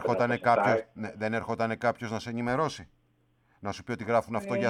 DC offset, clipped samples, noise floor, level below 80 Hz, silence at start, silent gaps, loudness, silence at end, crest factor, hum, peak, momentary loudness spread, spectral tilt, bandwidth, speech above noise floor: under 0.1%; under 0.1%; -69 dBFS; -64 dBFS; 0 s; none; -29 LUFS; 0 s; 22 dB; none; -8 dBFS; 14 LU; -6 dB/octave; 13 kHz; 40 dB